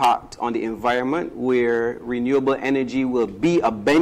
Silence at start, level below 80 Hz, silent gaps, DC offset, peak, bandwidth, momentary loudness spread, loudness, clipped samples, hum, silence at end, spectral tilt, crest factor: 0 s; -52 dBFS; none; under 0.1%; -10 dBFS; 15.5 kHz; 5 LU; -21 LUFS; under 0.1%; none; 0 s; -6 dB/octave; 10 dB